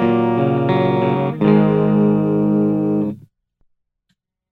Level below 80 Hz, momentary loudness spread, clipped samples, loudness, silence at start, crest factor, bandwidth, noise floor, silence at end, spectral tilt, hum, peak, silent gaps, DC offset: -50 dBFS; 5 LU; under 0.1%; -16 LUFS; 0 s; 14 dB; 4.4 kHz; -71 dBFS; 1.3 s; -10.5 dB/octave; none; -2 dBFS; none; under 0.1%